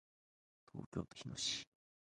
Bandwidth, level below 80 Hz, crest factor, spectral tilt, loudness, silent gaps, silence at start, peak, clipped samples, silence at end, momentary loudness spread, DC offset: 11 kHz; -70 dBFS; 22 dB; -3 dB/octave; -44 LUFS; 0.86-0.92 s; 0.75 s; -26 dBFS; under 0.1%; 0.5 s; 15 LU; under 0.1%